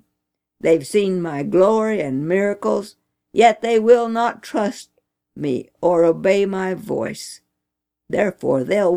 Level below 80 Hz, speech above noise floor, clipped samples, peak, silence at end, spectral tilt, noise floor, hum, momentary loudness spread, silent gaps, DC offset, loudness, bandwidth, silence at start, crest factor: -62 dBFS; 63 dB; under 0.1%; 0 dBFS; 0 s; -6 dB/octave; -81 dBFS; none; 10 LU; none; under 0.1%; -19 LUFS; 15.5 kHz; 0.65 s; 18 dB